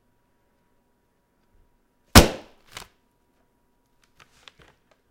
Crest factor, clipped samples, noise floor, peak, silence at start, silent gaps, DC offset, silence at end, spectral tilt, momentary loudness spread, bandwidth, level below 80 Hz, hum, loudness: 26 dB; under 0.1%; -68 dBFS; 0 dBFS; 2.15 s; none; under 0.1%; 2.75 s; -4 dB/octave; 28 LU; 16 kHz; -34 dBFS; none; -16 LUFS